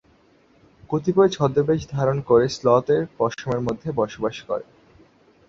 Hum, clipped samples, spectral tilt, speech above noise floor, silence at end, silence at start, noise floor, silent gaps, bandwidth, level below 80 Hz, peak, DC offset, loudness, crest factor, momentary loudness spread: none; under 0.1%; -7 dB/octave; 36 dB; 0.85 s; 0.9 s; -57 dBFS; none; 7.6 kHz; -52 dBFS; -4 dBFS; under 0.1%; -22 LUFS; 18 dB; 10 LU